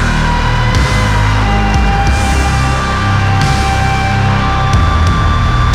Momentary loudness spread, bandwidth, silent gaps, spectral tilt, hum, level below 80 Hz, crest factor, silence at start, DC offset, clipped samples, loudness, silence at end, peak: 1 LU; 13.5 kHz; none; -5.5 dB/octave; none; -16 dBFS; 10 dB; 0 s; under 0.1%; under 0.1%; -12 LUFS; 0 s; 0 dBFS